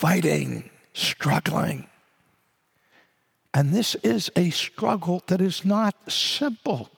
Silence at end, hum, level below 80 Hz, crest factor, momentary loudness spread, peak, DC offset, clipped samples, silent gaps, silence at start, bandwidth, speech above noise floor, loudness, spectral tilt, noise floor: 0.1 s; none; -66 dBFS; 18 dB; 7 LU; -6 dBFS; under 0.1%; under 0.1%; none; 0 s; 18.5 kHz; 45 dB; -24 LUFS; -5 dB/octave; -68 dBFS